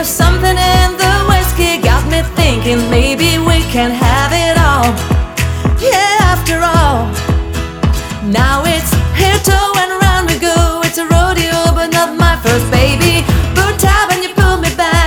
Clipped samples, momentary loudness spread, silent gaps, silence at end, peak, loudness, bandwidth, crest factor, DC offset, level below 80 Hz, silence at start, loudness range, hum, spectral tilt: under 0.1%; 5 LU; none; 0 s; 0 dBFS; -11 LUFS; 19.5 kHz; 10 dB; under 0.1%; -16 dBFS; 0 s; 2 LU; none; -4.5 dB/octave